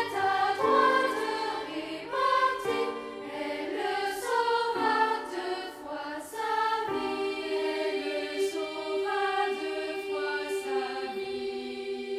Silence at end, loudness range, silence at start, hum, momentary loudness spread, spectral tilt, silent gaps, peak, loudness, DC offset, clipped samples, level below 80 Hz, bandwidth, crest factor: 0 s; 4 LU; 0 s; none; 11 LU; -3 dB/octave; none; -12 dBFS; -30 LUFS; under 0.1%; under 0.1%; -68 dBFS; 15.5 kHz; 18 dB